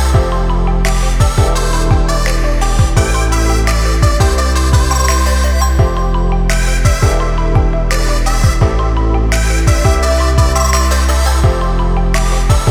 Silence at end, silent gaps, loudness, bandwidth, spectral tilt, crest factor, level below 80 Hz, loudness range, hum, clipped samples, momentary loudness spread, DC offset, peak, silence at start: 0 s; none; -13 LUFS; 16 kHz; -5 dB/octave; 10 dB; -12 dBFS; 1 LU; none; under 0.1%; 3 LU; under 0.1%; 0 dBFS; 0 s